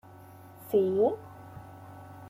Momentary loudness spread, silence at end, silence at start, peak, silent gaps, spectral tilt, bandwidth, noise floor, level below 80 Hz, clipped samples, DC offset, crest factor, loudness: 23 LU; 0 s; 0.15 s; -14 dBFS; none; -8 dB/octave; 16 kHz; -50 dBFS; -68 dBFS; under 0.1%; under 0.1%; 18 dB; -28 LUFS